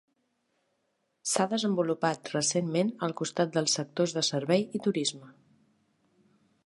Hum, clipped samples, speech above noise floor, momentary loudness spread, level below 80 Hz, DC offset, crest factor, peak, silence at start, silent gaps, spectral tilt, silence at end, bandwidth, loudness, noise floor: none; under 0.1%; 48 dB; 5 LU; -78 dBFS; under 0.1%; 20 dB; -12 dBFS; 1.25 s; none; -4 dB/octave; 1.35 s; 11.5 kHz; -29 LUFS; -77 dBFS